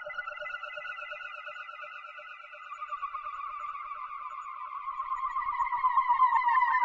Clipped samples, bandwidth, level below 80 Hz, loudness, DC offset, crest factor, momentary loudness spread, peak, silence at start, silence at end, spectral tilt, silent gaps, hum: under 0.1%; 7.4 kHz; -68 dBFS; -32 LUFS; under 0.1%; 18 dB; 17 LU; -14 dBFS; 0 s; 0 s; -1 dB/octave; none; none